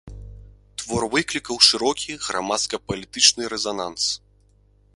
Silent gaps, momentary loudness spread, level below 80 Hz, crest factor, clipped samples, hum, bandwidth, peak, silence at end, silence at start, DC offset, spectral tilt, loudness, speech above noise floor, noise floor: none; 14 LU; -48 dBFS; 24 dB; under 0.1%; 50 Hz at -55 dBFS; 11.5 kHz; 0 dBFS; 0.8 s; 0.05 s; under 0.1%; -1.5 dB/octave; -20 LUFS; 35 dB; -57 dBFS